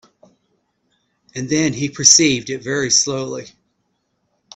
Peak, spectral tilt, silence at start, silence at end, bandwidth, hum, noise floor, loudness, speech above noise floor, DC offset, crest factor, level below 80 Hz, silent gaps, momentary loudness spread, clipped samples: 0 dBFS; -2 dB/octave; 1.35 s; 1.1 s; 16 kHz; none; -69 dBFS; -15 LUFS; 52 dB; under 0.1%; 20 dB; -56 dBFS; none; 19 LU; under 0.1%